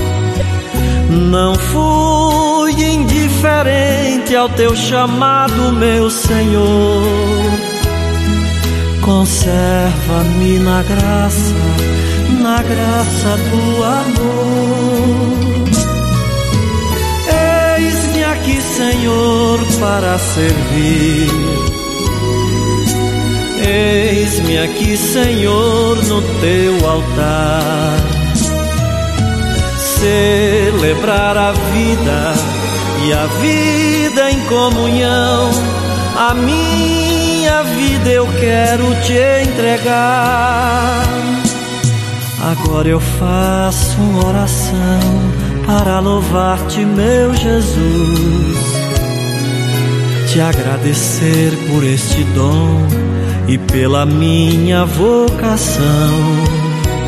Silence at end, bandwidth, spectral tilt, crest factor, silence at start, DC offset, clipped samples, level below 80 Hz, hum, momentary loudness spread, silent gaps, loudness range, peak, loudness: 0 s; 14.5 kHz; -5 dB/octave; 12 dB; 0 s; under 0.1%; under 0.1%; -22 dBFS; none; 4 LU; none; 2 LU; 0 dBFS; -13 LUFS